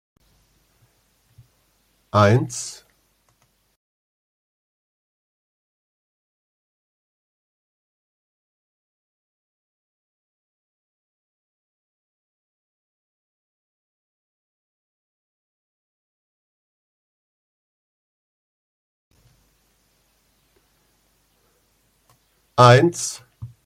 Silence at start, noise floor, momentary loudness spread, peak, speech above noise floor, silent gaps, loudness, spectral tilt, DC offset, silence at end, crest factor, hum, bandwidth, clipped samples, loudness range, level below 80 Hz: 2.15 s; -65 dBFS; 24 LU; 0 dBFS; 49 dB; 3.76-19.11 s; -18 LUFS; -5.5 dB/octave; under 0.1%; 0.2 s; 28 dB; none; 14.5 kHz; under 0.1%; 11 LU; -62 dBFS